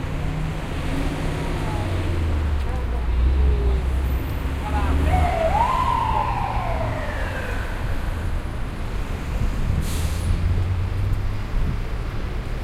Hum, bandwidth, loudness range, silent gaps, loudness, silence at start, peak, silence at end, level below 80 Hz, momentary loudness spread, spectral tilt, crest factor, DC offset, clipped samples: none; 14.5 kHz; 5 LU; none; -24 LUFS; 0 s; -8 dBFS; 0 s; -24 dBFS; 9 LU; -6.5 dB/octave; 14 dB; under 0.1%; under 0.1%